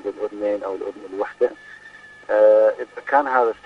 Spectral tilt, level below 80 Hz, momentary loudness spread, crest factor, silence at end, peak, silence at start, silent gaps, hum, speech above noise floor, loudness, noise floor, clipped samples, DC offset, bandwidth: -5 dB/octave; -66 dBFS; 24 LU; 18 dB; 0.15 s; -2 dBFS; 0.05 s; none; 50 Hz at -65 dBFS; 25 dB; -20 LUFS; -44 dBFS; under 0.1%; under 0.1%; 6.2 kHz